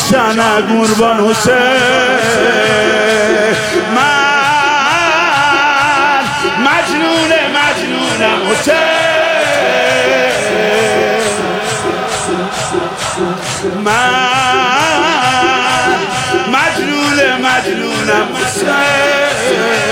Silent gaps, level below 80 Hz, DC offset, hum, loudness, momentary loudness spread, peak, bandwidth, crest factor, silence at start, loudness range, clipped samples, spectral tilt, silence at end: none; -46 dBFS; under 0.1%; none; -11 LUFS; 6 LU; 0 dBFS; 16.5 kHz; 10 dB; 0 s; 3 LU; under 0.1%; -3 dB/octave; 0 s